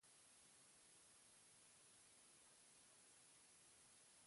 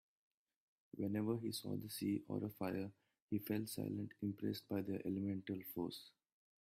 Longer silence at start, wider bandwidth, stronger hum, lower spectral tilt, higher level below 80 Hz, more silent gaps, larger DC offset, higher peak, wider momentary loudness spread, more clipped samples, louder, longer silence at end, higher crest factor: second, 0 s vs 0.95 s; second, 11.5 kHz vs 16 kHz; neither; second, -0.5 dB/octave vs -6 dB/octave; second, under -90 dBFS vs -80 dBFS; second, none vs 3.22-3.28 s; neither; second, -58 dBFS vs -28 dBFS; second, 0 LU vs 5 LU; neither; second, -68 LUFS vs -44 LUFS; second, 0 s vs 0.5 s; about the same, 12 dB vs 16 dB